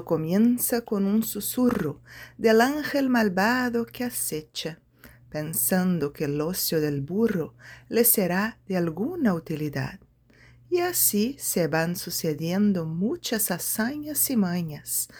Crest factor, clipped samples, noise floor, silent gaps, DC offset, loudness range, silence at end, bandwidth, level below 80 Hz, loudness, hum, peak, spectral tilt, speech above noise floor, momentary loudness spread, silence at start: 18 dB; under 0.1%; -56 dBFS; none; under 0.1%; 3 LU; 0 s; over 20 kHz; -58 dBFS; -25 LUFS; none; -6 dBFS; -4.5 dB/octave; 30 dB; 10 LU; 0 s